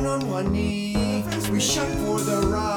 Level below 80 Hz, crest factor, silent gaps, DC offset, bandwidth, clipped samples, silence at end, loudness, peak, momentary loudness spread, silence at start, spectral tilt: -38 dBFS; 14 dB; none; under 0.1%; over 20 kHz; under 0.1%; 0 s; -24 LUFS; -8 dBFS; 3 LU; 0 s; -4.5 dB/octave